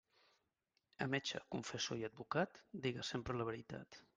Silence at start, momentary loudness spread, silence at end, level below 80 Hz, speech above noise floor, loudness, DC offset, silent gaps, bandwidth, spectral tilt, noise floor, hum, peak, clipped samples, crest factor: 1 s; 6 LU; 0.15 s; -72 dBFS; 42 dB; -43 LUFS; under 0.1%; none; 9.8 kHz; -4.5 dB/octave; -86 dBFS; none; -24 dBFS; under 0.1%; 22 dB